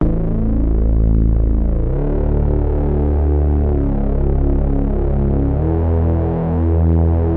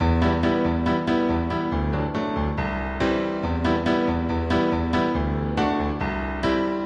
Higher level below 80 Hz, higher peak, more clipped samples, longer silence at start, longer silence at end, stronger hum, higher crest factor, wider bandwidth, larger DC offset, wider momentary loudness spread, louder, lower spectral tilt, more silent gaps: first, -18 dBFS vs -34 dBFS; about the same, -6 dBFS vs -8 dBFS; neither; about the same, 0 s vs 0 s; about the same, 0 s vs 0 s; neither; about the same, 10 dB vs 14 dB; second, 2.9 kHz vs 8.4 kHz; neither; about the same, 3 LU vs 4 LU; first, -17 LUFS vs -24 LUFS; first, -13.5 dB/octave vs -7.5 dB/octave; neither